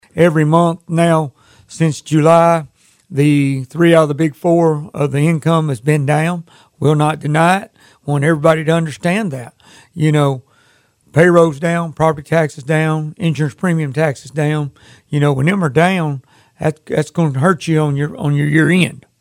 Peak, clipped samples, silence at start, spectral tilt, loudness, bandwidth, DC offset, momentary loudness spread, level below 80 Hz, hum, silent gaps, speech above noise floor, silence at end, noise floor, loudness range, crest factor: 0 dBFS; under 0.1%; 0.15 s; -7 dB/octave; -15 LUFS; 13 kHz; under 0.1%; 9 LU; -52 dBFS; none; none; 40 dB; 0.25 s; -54 dBFS; 3 LU; 14 dB